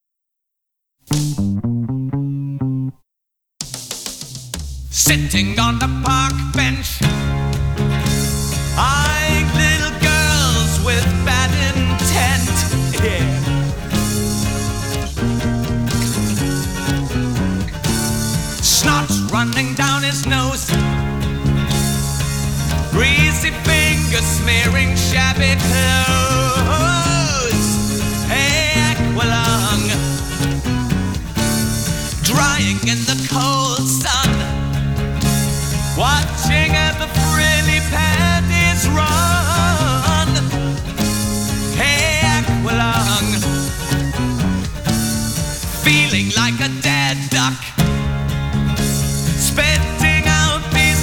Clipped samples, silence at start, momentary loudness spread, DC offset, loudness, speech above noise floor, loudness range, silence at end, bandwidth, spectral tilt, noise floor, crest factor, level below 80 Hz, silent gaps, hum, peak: under 0.1%; 1.1 s; 7 LU; under 0.1%; -16 LUFS; 63 dB; 5 LU; 0 s; 19.5 kHz; -4 dB/octave; -78 dBFS; 14 dB; -26 dBFS; none; none; -4 dBFS